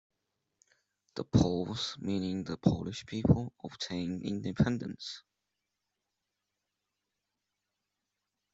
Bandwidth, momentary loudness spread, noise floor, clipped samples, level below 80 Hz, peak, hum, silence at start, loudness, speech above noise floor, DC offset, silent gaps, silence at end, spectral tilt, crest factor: 8 kHz; 14 LU; -87 dBFS; under 0.1%; -56 dBFS; -12 dBFS; none; 1.15 s; -33 LUFS; 54 dB; under 0.1%; none; 3.35 s; -6.5 dB/octave; 24 dB